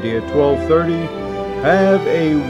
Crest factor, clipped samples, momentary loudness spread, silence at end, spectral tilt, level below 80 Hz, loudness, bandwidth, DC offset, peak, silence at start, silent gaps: 14 dB; under 0.1%; 10 LU; 0 s; -7.5 dB/octave; -40 dBFS; -16 LUFS; 11 kHz; under 0.1%; -2 dBFS; 0 s; none